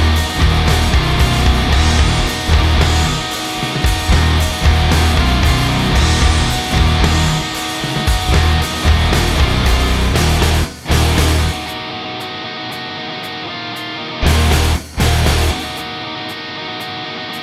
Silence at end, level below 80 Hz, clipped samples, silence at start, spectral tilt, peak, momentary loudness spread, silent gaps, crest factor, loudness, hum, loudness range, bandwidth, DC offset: 0 s; -18 dBFS; under 0.1%; 0 s; -4.5 dB/octave; 0 dBFS; 10 LU; none; 14 dB; -15 LUFS; none; 5 LU; 15 kHz; under 0.1%